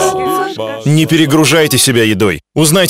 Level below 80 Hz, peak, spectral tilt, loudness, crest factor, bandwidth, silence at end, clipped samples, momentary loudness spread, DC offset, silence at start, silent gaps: -44 dBFS; 0 dBFS; -4 dB/octave; -11 LUFS; 10 dB; 16.5 kHz; 0 s; under 0.1%; 7 LU; under 0.1%; 0 s; none